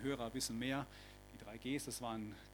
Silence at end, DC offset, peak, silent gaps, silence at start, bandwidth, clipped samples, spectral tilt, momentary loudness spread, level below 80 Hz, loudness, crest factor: 0 s; under 0.1%; -26 dBFS; none; 0 s; 19 kHz; under 0.1%; -4 dB/octave; 15 LU; -62 dBFS; -43 LUFS; 18 dB